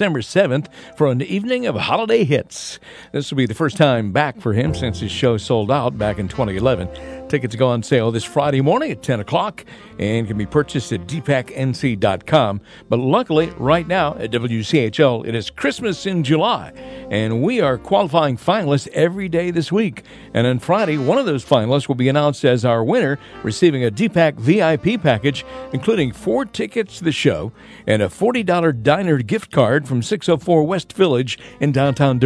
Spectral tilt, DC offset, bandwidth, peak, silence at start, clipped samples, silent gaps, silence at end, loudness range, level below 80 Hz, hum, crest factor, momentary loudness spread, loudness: -6.5 dB/octave; under 0.1%; 11 kHz; 0 dBFS; 0 s; under 0.1%; none; 0 s; 3 LU; -46 dBFS; none; 18 dB; 8 LU; -18 LUFS